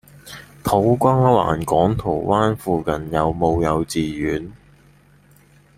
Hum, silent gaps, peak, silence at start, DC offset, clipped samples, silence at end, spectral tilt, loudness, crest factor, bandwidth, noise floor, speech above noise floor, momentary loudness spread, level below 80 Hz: none; none; -2 dBFS; 0.25 s; under 0.1%; under 0.1%; 1.2 s; -7 dB/octave; -19 LUFS; 18 dB; 16 kHz; -52 dBFS; 33 dB; 12 LU; -42 dBFS